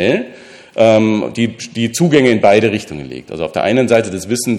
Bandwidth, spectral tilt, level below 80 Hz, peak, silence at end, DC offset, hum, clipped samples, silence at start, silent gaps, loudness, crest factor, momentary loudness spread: 14.5 kHz; -5 dB/octave; -50 dBFS; 0 dBFS; 0 s; under 0.1%; none; under 0.1%; 0 s; none; -14 LUFS; 14 dB; 17 LU